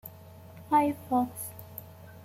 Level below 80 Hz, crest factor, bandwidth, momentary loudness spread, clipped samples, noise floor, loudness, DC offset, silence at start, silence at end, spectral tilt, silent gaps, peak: -68 dBFS; 18 dB; 16.5 kHz; 23 LU; under 0.1%; -49 dBFS; -29 LUFS; under 0.1%; 0.05 s; 0 s; -6 dB/octave; none; -14 dBFS